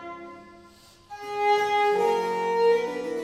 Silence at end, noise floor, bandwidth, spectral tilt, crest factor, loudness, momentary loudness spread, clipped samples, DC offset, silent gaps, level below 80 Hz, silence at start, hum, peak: 0 s; -53 dBFS; 14 kHz; -4 dB/octave; 16 dB; -24 LUFS; 19 LU; under 0.1%; under 0.1%; none; -66 dBFS; 0 s; none; -10 dBFS